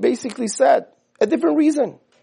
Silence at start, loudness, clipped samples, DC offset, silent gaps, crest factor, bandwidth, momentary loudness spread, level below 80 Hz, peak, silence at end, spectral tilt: 0 s; -19 LUFS; under 0.1%; under 0.1%; none; 16 dB; 11 kHz; 8 LU; -74 dBFS; -4 dBFS; 0.3 s; -4.5 dB/octave